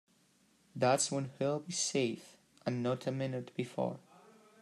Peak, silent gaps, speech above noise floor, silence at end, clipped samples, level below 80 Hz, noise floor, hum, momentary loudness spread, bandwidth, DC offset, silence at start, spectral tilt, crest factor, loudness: -16 dBFS; none; 35 dB; 0.65 s; under 0.1%; -80 dBFS; -70 dBFS; none; 11 LU; 13 kHz; under 0.1%; 0.75 s; -4 dB/octave; 20 dB; -35 LUFS